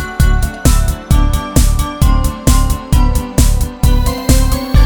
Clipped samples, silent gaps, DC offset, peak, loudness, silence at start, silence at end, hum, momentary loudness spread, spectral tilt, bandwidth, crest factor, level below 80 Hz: 0.3%; none; under 0.1%; 0 dBFS; -14 LUFS; 0 s; 0 s; none; 2 LU; -5 dB/octave; 20 kHz; 10 dB; -12 dBFS